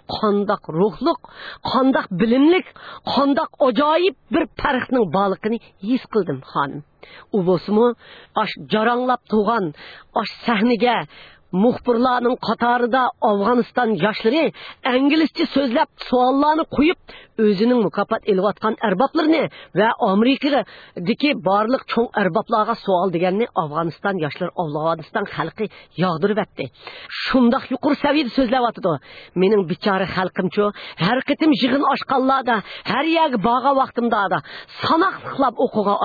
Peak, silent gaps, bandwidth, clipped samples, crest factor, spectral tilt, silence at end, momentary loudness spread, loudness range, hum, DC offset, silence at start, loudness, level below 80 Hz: -4 dBFS; none; 4.9 kHz; under 0.1%; 16 dB; -8 dB/octave; 0 s; 9 LU; 3 LU; none; under 0.1%; 0.1 s; -19 LUFS; -52 dBFS